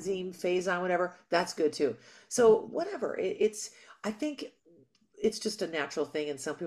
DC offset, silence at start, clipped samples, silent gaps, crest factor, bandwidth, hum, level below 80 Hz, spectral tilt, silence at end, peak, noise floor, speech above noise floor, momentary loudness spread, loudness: under 0.1%; 0 s; under 0.1%; none; 18 dB; 14 kHz; none; -72 dBFS; -4 dB/octave; 0 s; -12 dBFS; -63 dBFS; 32 dB; 13 LU; -31 LUFS